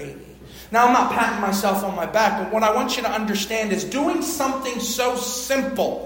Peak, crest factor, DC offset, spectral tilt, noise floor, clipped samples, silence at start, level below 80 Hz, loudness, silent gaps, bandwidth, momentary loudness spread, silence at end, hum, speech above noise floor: -4 dBFS; 18 dB; under 0.1%; -3.5 dB/octave; -41 dBFS; under 0.1%; 0 s; -50 dBFS; -21 LUFS; none; 16.5 kHz; 6 LU; 0 s; none; 20 dB